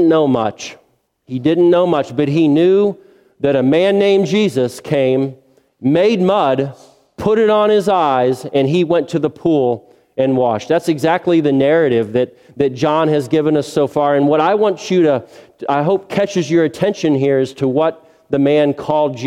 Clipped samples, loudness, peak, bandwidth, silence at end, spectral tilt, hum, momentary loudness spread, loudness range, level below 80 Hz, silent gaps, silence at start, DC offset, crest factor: under 0.1%; -15 LUFS; 0 dBFS; 13.5 kHz; 0 s; -6.5 dB/octave; none; 7 LU; 2 LU; -56 dBFS; none; 0 s; under 0.1%; 14 dB